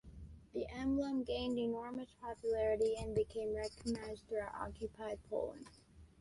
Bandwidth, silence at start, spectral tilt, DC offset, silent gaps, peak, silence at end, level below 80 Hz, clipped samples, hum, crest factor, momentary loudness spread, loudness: 11.5 kHz; 0.05 s; -6 dB/octave; under 0.1%; none; -26 dBFS; 0.15 s; -58 dBFS; under 0.1%; none; 14 dB; 11 LU; -40 LUFS